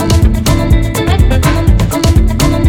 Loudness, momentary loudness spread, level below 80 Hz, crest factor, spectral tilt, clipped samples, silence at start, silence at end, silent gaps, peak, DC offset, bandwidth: -11 LUFS; 2 LU; -12 dBFS; 8 dB; -6 dB/octave; under 0.1%; 0 s; 0 s; none; 0 dBFS; under 0.1%; 18 kHz